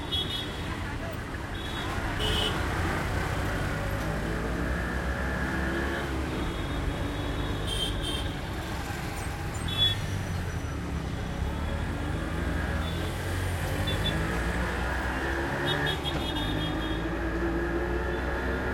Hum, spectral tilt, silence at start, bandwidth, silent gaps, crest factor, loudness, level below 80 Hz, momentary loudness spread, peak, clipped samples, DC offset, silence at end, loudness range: none; -5 dB/octave; 0 s; 16.5 kHz; none; 16 dB; -30 LUFS; -36 dBFS; 6 LU; -14 dBFS; under 0.1%; under 0.1%; 0 s; 2 LU